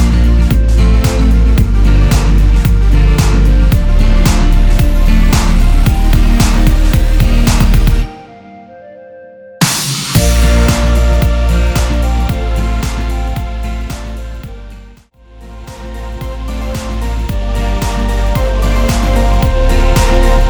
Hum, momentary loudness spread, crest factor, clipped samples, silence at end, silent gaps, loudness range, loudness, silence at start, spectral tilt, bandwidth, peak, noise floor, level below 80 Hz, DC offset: none; 12 LU; 10 dB; under 0.1%; 0 s; none; 11 LU; -12 LUFS; 0 s; -5.5 dB/octave; over 20 kHz; 0 dBFS; -38 dBFS; -10 dBFS; under 0.1%